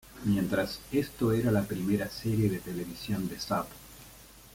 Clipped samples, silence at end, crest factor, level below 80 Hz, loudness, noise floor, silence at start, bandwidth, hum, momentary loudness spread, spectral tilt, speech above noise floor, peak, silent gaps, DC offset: under 0.1%; 0 s; 18 dB; -54 dBFS; -31 LUFS; -52 dBFS; 0.05 s; 17 kHz; none; 19 LU; -6.5 dB/octave; 22 dB; -14 dBFS; none; under 0.1%